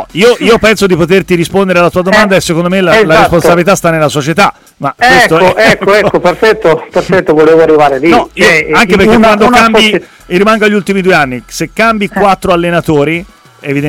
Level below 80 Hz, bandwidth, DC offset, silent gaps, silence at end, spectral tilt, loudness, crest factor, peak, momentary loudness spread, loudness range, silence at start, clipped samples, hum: -34 dBFS; 17 kHz; under 0.1%; none; 0 s; -5 dB/octave; -7 LUFS; 6 dB; 0 dBFS; 6 LU; 3 LU; 0 s; 0.3%; none